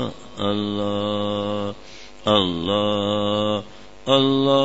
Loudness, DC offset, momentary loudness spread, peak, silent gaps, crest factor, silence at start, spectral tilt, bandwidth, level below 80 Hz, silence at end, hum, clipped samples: -22 LUFS; 0.8%; 13 LU; -2 dBFS; none; 20 dB; 0 s; -6 dB/octave; 8 kHz; -52 dBFS; 0 s; none; under 0.1%